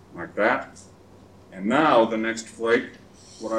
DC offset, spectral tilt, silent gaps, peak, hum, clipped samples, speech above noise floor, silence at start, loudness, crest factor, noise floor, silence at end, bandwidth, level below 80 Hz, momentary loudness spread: under 0.1%; -4.5 dB/octave; none; -6 dBFS; none; under 0.1%; 27 dB; 0.1 s; -23 LUFS; 20 dB; -50 dBFS; 0 s; 11 kHz; -62 dBFS; 20 LU